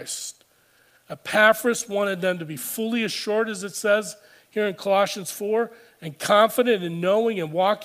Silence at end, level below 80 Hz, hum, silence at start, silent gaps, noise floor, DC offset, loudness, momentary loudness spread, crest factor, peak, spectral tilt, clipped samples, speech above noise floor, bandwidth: 0 s; -74 dBFS; none; 0 s; none; -60 dBFS; under 0.1%; -23 LUFS; 14 LU; 20 dB; -2 dBFS; -3.5 dB/octave; under 0.1%; 37 dB; 15.5 kHz